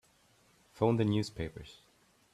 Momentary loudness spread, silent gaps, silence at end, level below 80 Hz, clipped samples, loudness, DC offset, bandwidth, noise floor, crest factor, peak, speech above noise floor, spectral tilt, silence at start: 21 LU; none; 0.6 s; -60 dBFS; under 0.1%; -33 LUFS; under 0.1%; 12.5 kHz; -67 dBFS; 22 dB; -14 dBFS; 35 dB; -7 dB/octave; 0.75 s